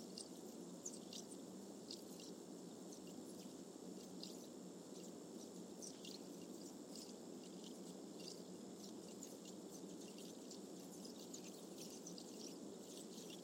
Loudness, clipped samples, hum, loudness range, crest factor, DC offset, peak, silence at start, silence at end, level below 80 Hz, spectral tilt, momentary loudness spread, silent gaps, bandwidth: -54 LUFS; under 0.1%; none; 1 LU; 18 dB; under 0.1%; -36 dBFS; 0 s; 0 s; under -90 dBFS; -4 dB/octave; 2 LU; none; 16 kHz